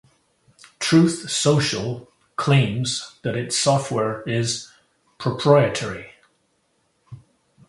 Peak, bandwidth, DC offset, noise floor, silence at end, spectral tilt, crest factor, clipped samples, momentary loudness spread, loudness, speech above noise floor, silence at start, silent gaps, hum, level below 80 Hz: 0 dBFS; 11.5 kHz; under 0.1%; -67 dBFS; 0.5 s; -5 dB/octave; 22 dB; under 0.1%; 12 LU; -21 LUFS; 47 dB; 0.8 s; none; none; -56 dBFS